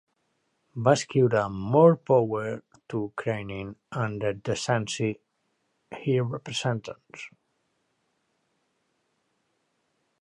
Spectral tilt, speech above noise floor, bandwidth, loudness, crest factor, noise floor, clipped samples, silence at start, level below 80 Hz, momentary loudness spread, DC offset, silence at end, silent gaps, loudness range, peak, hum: -6 dB/octave; 49 dB; 10.5 kHz; -26 LUFS; 22 dB; -75 dBFS; under 0.1%; 0.75 s; -62 dBFS; 21 LU; under 0.1%; 2.95 s; none; 10 LU; -6 dBFS; none